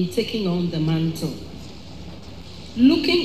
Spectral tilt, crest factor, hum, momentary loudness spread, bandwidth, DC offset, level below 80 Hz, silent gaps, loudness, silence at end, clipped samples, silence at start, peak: -6.5 dB/octave; 16 dB; none; 22 LU; 14 kHz; 0.8%; -46 dBFS; none; -21 LUFS; 0 s; under 0.1%; 0 s; -6 dBFS